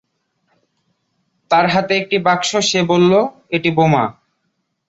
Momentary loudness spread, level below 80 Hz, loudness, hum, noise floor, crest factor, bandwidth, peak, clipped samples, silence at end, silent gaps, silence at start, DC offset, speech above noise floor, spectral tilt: 5 LU; -56 dBFS; -15 LUFS; none; -70 dBFS; 16 dB; 8 kHz; 0 dBFS; under 0.1%; 0.75 s; none; 1.5 s; under 0.1%; 55 dB; -4.5 dB/octave